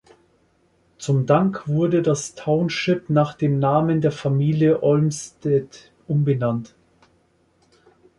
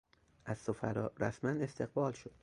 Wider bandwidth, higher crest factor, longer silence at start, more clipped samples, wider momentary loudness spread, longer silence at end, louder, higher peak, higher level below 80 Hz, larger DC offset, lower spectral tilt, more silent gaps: about the same, 11.5 kHz vs 11 kHz; about the same, 16 dB vs 20 dB; first, 1 s vs 0.45 s; neither; about the same, 7 LU vs 6 LU; first, 1.5 s vs 0.15 s; first, -21 LUFS vs -38 LUFS; first, -4 dBFS vs -20 dBFS; first, -58 dBFS vs -66 dBFS; neither; about the same, -7 dB/octave vs -7.5 dB/octave; neither